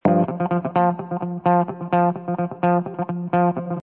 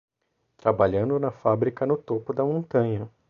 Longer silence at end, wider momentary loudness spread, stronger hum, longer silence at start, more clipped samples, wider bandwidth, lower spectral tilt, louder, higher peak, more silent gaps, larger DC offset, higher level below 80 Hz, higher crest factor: second, 0 s vs 0.2 s; about the same, 7 LU vs 5 LU; neither; second, 0.05 s vs 0.65 s; neither; second, 3.8 kHz vs 6.6 kHz; first, -12 dB/octave vs -10.5 dB/octave; first, -22 LUFS vs -25 LUFS; about the same, -4 dBFS vs -6 dBFS; neither; neither; second, -64 dBFS vs -54 dBFS; about the same, 16 dB vs 20 dB